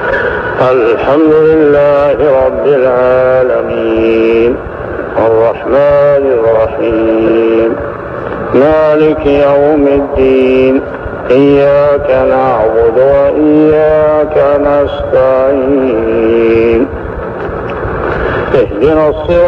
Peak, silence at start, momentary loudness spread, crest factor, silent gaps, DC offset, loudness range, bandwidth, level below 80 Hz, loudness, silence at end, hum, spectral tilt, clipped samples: 0 dBFS; 0 s; 9 LU; 8 dB; none; under 0.1%; 3 LU; 5.8 kHz; -30 dBFS; -9 LUFS; 0 s; none; -8.5 dB/octave; under 0.1%